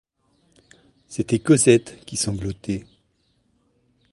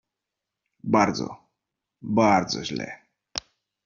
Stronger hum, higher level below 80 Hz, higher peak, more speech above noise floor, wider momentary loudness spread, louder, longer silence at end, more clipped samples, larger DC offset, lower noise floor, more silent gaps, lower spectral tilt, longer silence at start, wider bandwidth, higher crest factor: neither; first, -50 dBFS vs -60 dBFS; first, -2 dBFS vs -6 dBFS; second, 46 dB vs 63 dB; about the same, 16 LU vs 18 LU; first, -21 LUFS vs -24 LUFS; first, 1.3 s vs 0.45 s; neither; neither; second, -66 dBFS vs -86 dBFS; neither; about the same, -5 dB/octave vs -4 dB/octave; first, 1.1 s vs 0.85 s; first, 11.5 kHz vs 7.4 kHz; about the same, 22 dB vs 20 dB